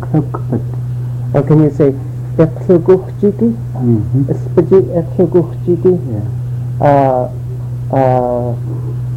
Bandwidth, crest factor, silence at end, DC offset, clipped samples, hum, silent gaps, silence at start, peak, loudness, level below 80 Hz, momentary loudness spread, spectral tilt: 5.2 kHz; 12 dB; 0 s; under 0.1%; under 0.1%; none; none; 0 s; 0 dBFS; -13 LUFS; -36 dBFS; 10 LU; -10.5 dB/octave